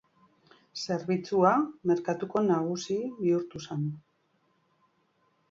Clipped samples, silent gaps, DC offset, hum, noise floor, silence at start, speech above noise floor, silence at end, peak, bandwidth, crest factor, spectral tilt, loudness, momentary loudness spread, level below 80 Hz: under 0.1%; none; under 0.1%; none; -71 dBFS; 0.75 s; 43 dB; 1.5 s; -10 dBFS; 7.6 kHz; 20 dB; -6.5 dB/octave; -29 LUFS; 12 LU; -72 dBFS